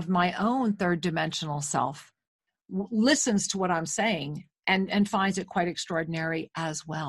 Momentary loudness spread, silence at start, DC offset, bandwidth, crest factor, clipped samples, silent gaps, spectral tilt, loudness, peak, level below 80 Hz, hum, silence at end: 9 LU; 0 s; under 0.1%; 12.5 kHz; 20 dB; under 0.1%; 2.27-2.39 s; -4 dB/octave; -28 LUFS; -8 dBFS; -64 dBFS; none; 0 s